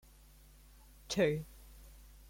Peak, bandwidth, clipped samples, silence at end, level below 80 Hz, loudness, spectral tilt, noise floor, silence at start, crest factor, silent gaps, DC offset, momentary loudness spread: -18 dBFS; 16.5 kHz; under 0.1%; 0.25 s; -58 dBFS; -35 LUFS; -5 dB/octave; -60 dBFS; 1.1 s; 22 dB; none; under 0.1%; 25 LU